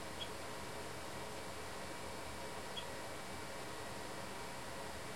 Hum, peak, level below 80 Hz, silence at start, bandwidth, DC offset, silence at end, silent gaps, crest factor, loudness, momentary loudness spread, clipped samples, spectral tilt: none; -32 dBFS; -64 dBFS; 0 s; 16.5 kHz; 0.3%; 0 s; none; 16 dB; -46 LUFS; 1 LU; under 0.1%; -3 dB/octave